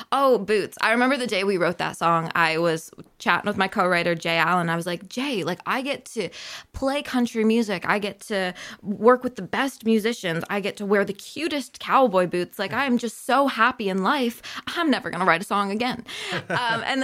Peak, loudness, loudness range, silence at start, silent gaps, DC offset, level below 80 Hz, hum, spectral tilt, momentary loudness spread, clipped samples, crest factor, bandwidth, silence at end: -2 dBFS; -23 LUFS; 3 LU; 0 s; none; under 0.1%; -58 dBFS; none; -4.5 dB/octave; 9 LU; under 0.1%; 20 dB; 16 kHz; 0 s